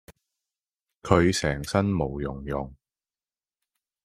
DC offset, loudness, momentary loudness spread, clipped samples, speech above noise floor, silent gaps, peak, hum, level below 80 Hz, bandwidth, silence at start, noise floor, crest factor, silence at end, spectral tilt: under 0.1%; -26 LUFS; 13 LU; under 0.1%; over 65 dB; none; -2 dBFS; none; -46 dBFS; 15.5 kHz; 0.1 s; under -90 dBFS; 26 dB; 1.3 s; -5.5 dB/octave